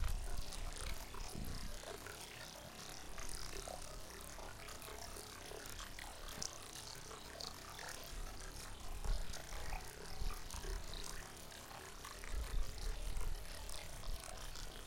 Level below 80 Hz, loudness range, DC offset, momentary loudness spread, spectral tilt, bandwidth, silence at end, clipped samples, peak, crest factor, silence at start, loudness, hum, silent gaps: -48 dBFS; 1 LU; under 0.1%; 5 LU; -3 dB/octave; 17 kHz; 0 s; under 0.1%; -22 dBFS; 22 dB; 0 s; -49 LUFS; none; none